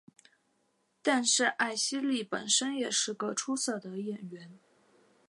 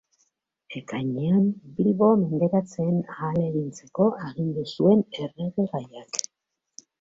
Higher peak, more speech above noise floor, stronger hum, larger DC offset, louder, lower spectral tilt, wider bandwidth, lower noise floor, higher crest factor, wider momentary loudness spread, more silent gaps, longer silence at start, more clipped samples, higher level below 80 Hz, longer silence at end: second, -14 dBFS vs -2 dBFS; second, 43 dB vs 58 dB; neither; neither; second, -30 LUFS vs -25 LUFS; second, -1.5 dB/octave vs -7 dB/octave; first, 11.5 kHz vs 7.8 kHz; second, -75 dBFS vs -82 dBFS; about the same, 20 dB vs 22 dB; about the same, 13 LU vs 12 LU; neither; first, 1.05 s vs 0.7 s; neither; second, -86 dBFS vs -64 dBFS; about the same, 0.7 s vs 0.8 s